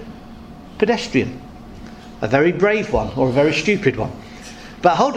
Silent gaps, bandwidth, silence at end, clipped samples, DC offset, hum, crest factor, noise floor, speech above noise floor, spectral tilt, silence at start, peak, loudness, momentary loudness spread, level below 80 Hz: none; 11 kHz; 0 s; under 0.1%; under 0.1%; none; 20 dB; -37 dBFS; 20 dB; -6 dB/octave; 0 s; 0 dBFS; -18 LUFS; 22 LU; -40 dBFS